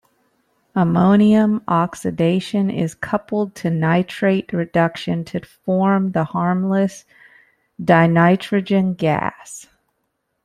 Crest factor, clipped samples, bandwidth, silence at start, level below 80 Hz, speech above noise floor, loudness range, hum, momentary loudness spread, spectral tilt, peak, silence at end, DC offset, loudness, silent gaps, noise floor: 16 dB; under 0.1%; 12 kHz; 0.75 s; -56 dBFS; 54 dB; 3 LU; none; 11 LU; -7.5 dB/octave; -2 dBFS; 0.8 s; under 0.1%; -18 LUFS; none; -72 dBFS